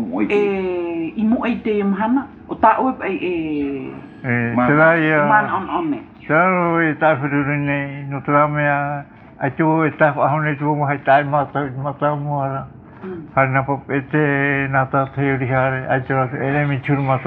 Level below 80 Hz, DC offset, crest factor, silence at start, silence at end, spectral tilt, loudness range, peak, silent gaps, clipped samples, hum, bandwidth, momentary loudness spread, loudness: -52 dBFS; under 0.1%; 18 dB; 0 s; 0 s; -10 dB/octave; 3 LU; 0 dBFS; none; under 0.1%; none; 4.3 kHz; 10 LU; -18 LUFS